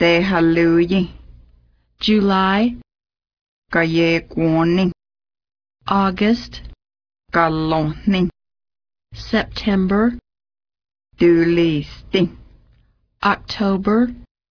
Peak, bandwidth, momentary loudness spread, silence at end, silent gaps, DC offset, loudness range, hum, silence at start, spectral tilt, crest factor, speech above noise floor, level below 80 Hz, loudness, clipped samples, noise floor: -2 dBFS; 5.4 kHz; 8 LU; 0.3 s; 3.41-3.62 s; under 0.1%; 3 LU; none; 0 s; -7.5 dB/octave; 16 dB; 41 dB; -42 dBFS; -18 LUFS; under 0.1%; -58 dBFS